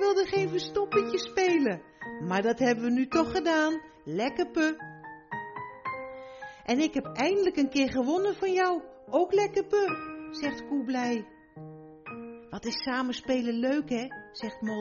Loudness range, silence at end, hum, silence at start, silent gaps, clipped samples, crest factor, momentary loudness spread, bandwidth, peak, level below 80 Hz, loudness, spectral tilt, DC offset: 6 LU; 0 s; none; 0 s; none; under 0.1%; 16 dB; 16 LU; 7.2 kHz; -12 dBFS; -62 dBFS; -29 LUFS; -3.5 dB/octave; under 0.1%